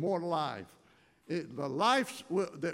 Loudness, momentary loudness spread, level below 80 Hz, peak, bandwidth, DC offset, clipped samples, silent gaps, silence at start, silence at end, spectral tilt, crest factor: -33 LUFS; 11 LU; -80 dBFS; -16 dBFS; 16 kHz; under 0.1%; under 0.1%; none; 0 s; 0 s; -5 dB/octave; 18 dB